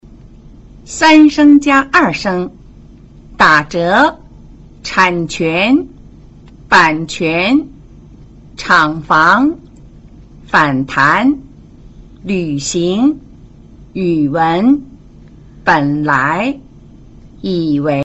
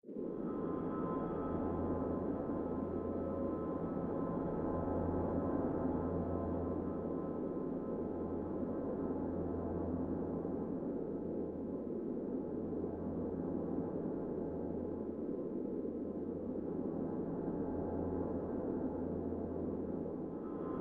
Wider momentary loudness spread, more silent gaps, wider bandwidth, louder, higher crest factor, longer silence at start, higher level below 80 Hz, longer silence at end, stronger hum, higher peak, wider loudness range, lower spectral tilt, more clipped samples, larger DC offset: first, 14 LU vs 4 LU; neither; first, 8.2 kHz vs 3.5 kHz; first, -12 LUFS vs -40 LUFS; about the same, 14 dB vs 16 dB; first, 0.85 s vs 0.05 s; first, -40 dBFS vs -60 dBFS; about the same, 0 s vs 0 s; neither; first, 0 dBFS vs -24 dBFS; about the same, 5 LU vs 3 LU; second, -5 dB/octave vs -11 dB/octave; neither; neither